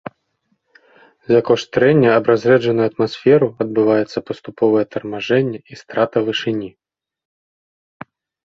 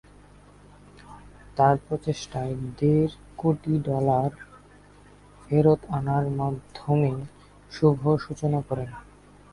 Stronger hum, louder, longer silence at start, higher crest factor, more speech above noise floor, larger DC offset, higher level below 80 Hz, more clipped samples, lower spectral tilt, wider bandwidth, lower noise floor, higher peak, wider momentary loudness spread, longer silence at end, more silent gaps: second, none vs 50 Hz at -40 dBFS; first, -17 LUFS vs -25 LUFS; first, 1.3 s vs 1.1 s; about the same, 16 dB vs 20 dB; first, 52 dB vs 28 dB; neither; second, -58 dBFS vs -52 dBFS; neither; second, -7 dB/octave vs -8.5 dB/octave; second, 7.4 kHz vs 11 kHz; first, -68 dBFS vs -52 dBFS; first, -2 dBFS vs -6 dBFS; about the same, 12 LU vs 14 LU; first, 1.75 s vs 0.5 s; neither